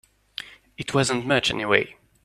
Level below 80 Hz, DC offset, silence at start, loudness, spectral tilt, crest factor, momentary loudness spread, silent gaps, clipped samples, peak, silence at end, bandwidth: -56 dBFS; under 0.1%; 0.4 s; -22 LUFS; -4 dB/octave; 22 dB; 16 LU; none; under 0.1%; -2 dBFS; 0.35 s; 14 kHz